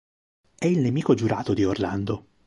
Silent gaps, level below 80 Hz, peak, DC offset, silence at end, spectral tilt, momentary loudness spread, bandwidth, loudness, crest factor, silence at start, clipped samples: none; -50 dBFS; -8 dBFS; under 0.1%; 0.25 s; -7.5 dB/octave; 6 LU; 11.5 kHz; -24 LUFS; 18 dB; 0.6 s; under 0.1%